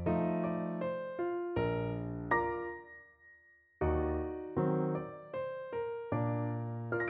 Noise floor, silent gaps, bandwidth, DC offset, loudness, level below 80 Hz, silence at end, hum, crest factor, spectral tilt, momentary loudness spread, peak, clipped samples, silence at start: -64 dBFS; none; 4.6 kHz; under 0.1%; -36 LUFS; -50 dBFS; 0 s; none; 18 dB; -7.5 dB/octave; 8 LU; -18 dBFS; under 0.1%; 0 s